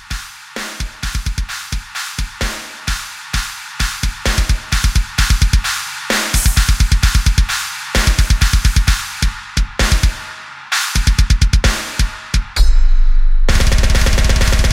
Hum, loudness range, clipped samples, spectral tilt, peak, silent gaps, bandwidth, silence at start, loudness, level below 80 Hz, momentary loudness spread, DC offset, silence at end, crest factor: none; 7 LU; under 0.1%; -3.5 dB/octave; 0 dBFS; none; 16.5 kHz; 0.1 s; -17 LUFS; -14 dBFS; 10 LU; under 0.1%; 0 s; 14 dB